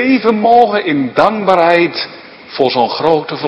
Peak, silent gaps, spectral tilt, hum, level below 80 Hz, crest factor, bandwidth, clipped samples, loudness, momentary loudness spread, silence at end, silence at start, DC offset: 0 dBFS; none; -6.5 dB/octave; none; -54 dBFS; 12 dB; 8.6 kHz; 0.4%; -12 LUFS; 8 LU; 0 s; 0 s; under 0.1%